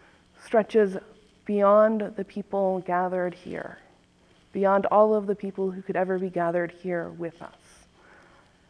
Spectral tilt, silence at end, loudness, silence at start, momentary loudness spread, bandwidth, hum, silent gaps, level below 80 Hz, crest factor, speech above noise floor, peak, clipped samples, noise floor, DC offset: -8 dB/octave; 1.25 s; -25 LUFS; 0.45 s; 17 LU; 10 kHz; none; none; -66 dBFS; 20 dB; 35 dB; -8 dBFS; under 0.1%; -60 dBFS; under 0.1%